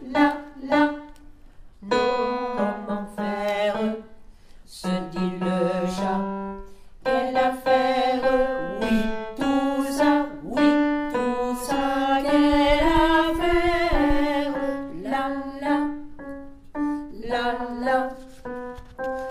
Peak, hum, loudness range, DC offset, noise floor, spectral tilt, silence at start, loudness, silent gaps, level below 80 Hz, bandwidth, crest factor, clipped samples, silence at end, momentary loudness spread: -6 dBFS; none; 7 LU; under 0.1%; -45 dBFS; -5.5 dB/octave; 0 s; -24 LUFS; none; -38 dBFS; 15 kHz; 18 dB; under 0.1%; 0 s; 14 LU